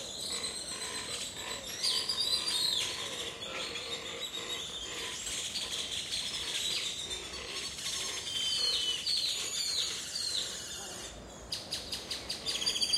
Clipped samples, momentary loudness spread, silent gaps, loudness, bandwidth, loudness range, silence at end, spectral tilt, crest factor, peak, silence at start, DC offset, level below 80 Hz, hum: under 0.1%; 9 LU; none; -33 LUFS; 16 kHz; 4 LU; 0 s; 0 dB/octave; 20 dB; -16 dBFS; 0 s; under 0.1%; -60 dBFS; none